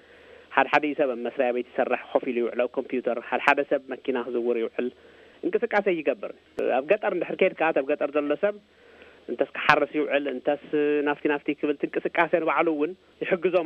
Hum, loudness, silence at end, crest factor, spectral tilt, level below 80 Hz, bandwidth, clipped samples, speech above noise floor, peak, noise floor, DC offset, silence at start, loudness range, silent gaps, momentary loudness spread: none; -26 LUFS; 0 s; 24 dB; -6 dB/octave; -68 dBFS; 8.4 kHz; under 0.1%; 25 dB; -2 dBFS; -51 dBFS; under 0.1%; 0.5 s; 2 LU; none; 8 LU